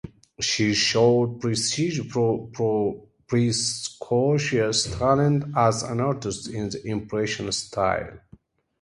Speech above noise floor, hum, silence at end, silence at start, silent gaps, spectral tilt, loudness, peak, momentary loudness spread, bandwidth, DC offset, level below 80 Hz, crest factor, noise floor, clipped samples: 31 dB; none; 0.65 s; 0.05 s; none; -4.5 dB/octave; -24 LUFS; -6 dBFS; 10 LU; 11.5 kHz; under 0.1%; -50 dBFS; 18 dB; -54 dBFS; under 0.1%